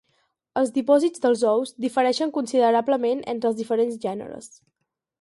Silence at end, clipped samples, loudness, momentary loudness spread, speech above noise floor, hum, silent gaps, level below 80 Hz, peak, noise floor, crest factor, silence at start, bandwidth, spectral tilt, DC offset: 0.75 s; under 0.1%; -22 LUFS; 11 LU; 48 dB; none; none; -70 dBFS; -6 dBFS; -70 dBFS; 18 dB; 0.55 s; 11.5 kHz; -4.5 dB/octave; under 0.1%